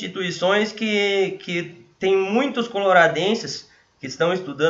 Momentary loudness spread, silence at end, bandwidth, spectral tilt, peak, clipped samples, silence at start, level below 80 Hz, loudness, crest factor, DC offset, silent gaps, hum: 15 LU; 0 s; 7.8 kHz; -4.5 dB/octave; -2 dBFS; under 0.1%; 0 s; -66 dBFS; -21 LUFS; 20 dB; under 0.1%; none; none